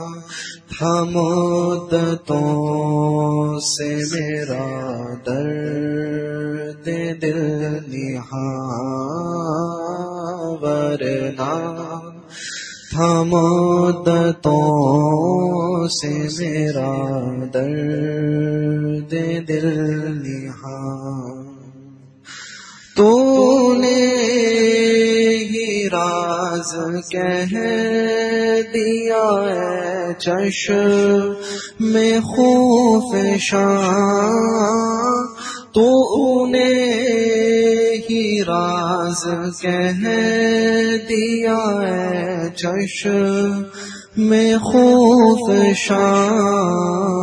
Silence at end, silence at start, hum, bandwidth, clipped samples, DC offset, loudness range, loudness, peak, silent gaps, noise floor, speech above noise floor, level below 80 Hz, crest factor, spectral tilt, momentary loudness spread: 0 s; 0 s; none; 10.5 kHz; under 0.1%; under 0.1%; 9 LU; -17 LUFS; -2 dBFS; none; -43 dBFS; 26 dB; -56 dBFS; 16 dB; -5.5 dB/octave; 13 LU